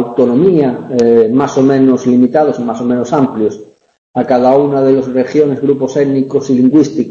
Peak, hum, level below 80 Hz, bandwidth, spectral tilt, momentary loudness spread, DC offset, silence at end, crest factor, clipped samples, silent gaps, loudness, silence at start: 0 dBFS; none; -52 dBFS; 7.4 kHz; -7.5 dB/octave; 6 LU; under 0.1%; 0 s; 10 dB; under 0.1%; 3.98-4.14 s; -11 LUFS; 0 s